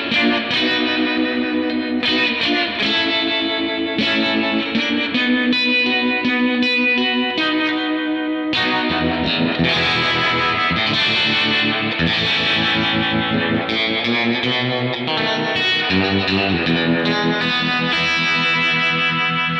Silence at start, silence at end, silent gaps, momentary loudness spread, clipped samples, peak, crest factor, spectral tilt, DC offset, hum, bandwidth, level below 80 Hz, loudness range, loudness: 0 s; 0 s; none; 4 LU; under 0.1%; -6 dBFS; 12 dB; -5 dB/octave; under 0.1%; none; 8.6 kHz; -48 dBFS; 2 LU; -17 LUFS